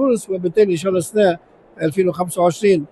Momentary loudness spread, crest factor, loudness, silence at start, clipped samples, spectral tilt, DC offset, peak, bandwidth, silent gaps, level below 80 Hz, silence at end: 5 LU; 14 dB; -18 LUFS; 0 s; under 0.1%; -6 dB/octave; under 0.1%; -4 dBFS; 12.5 kHz; none; -58 dBFS; 0.05 s